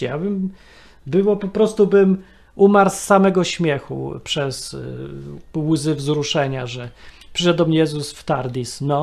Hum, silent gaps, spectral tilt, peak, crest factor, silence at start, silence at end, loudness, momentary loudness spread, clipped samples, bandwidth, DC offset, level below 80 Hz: none; none; -5.5 dB/octave; 0 dBFS; 18 dB; 0 s; 0 s; -19 LUFS; 15 LU; under 0.1%; 13.5 kHz; under 0.1%; -48 dBFS